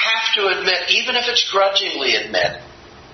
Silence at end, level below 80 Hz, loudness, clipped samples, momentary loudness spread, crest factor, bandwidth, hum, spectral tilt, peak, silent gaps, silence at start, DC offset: 0 s; -56 dBFS; -16 LUFS; under 0.1%; 5 LU; 18 dB; 6.4 kHz; none; -1 dB/octave; 0 dBFS; none; 0 s; under 0.1%